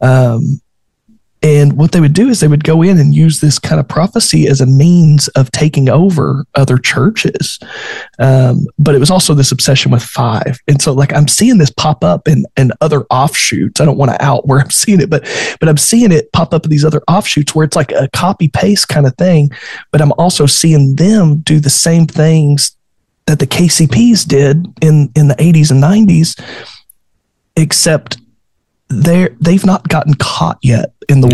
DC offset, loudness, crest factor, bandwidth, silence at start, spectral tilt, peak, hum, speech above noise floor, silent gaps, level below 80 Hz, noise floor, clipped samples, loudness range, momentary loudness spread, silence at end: under 0.1%; -9 LUFS; 8 dB; 12.5 kHz; 0 s; -5.5 dB/octave; 0 dBFS; none; 56 dB; none; -40 dBFS; -64 dBFS; under 0.1%; 3 LU; 7 LU; 0 s